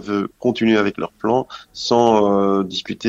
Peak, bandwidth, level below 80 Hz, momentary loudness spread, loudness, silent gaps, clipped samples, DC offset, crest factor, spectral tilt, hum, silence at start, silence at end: -2 dBFS; 8 kHz; -54 dBFS; 10 LU; -18 LUFS; none; under 0.1%; under 0.1%; 16 dB; -5.5 dB/octave; none; 0 s; 0 s